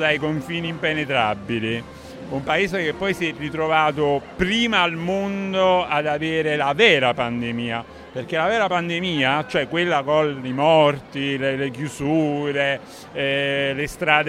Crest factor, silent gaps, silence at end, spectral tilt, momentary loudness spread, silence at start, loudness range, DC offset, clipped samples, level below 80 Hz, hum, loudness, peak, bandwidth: 20 dB; none; 0 s; -5 dB/octave; 9 LU; 0 s; 3 LU; under 0.1%; under 0.1%; -50 dBFS; none; -21 LUFS; 0 dBFS; 15.5 kHz